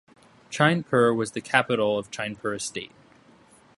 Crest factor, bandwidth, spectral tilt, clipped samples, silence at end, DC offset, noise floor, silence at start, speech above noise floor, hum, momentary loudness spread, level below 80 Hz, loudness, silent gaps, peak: 24 dB; 11.5 kHz; -4.5 dB/octave; under 0.1%; 0.9 s; under 0.1%; -55 dBFS; 0.5 s; 31 dB; none; 13 LU; -64 dBFS; -24 LUFS; none; -2 dBFS